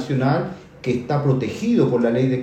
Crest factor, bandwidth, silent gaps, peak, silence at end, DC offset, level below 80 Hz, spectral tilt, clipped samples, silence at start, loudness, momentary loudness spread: 16 dB; 8.4 kHz; none; -4 dBFS; 0 s; under 0.1%; -54 dBFS; -8 dB/octave; under 0.1%; 0 s; -20 LUFS; 7 LU